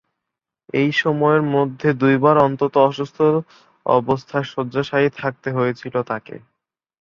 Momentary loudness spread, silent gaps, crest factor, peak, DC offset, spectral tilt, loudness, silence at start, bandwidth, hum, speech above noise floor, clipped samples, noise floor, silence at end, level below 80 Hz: 10 LU; none; 18 dB; -2 dBFS; under 0.1%; -7.5 dB/octave; -19 LUFS; 0.75 s; 7.2 kHz; none; 65 dB; under 0.1%; -83 dBFS; 0.65 s; -60 dBFS